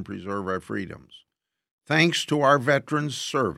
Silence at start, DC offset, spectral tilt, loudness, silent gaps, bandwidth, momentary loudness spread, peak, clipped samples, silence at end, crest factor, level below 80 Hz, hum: 0 s; under 0.1%; -4.5 dB/octave; -24 LUFS; 1.71-1.78 s; 15 kHz; 13 LU; -4 dBFS; under 0.1%; 0 s; 20 dB; -64 dBFS; none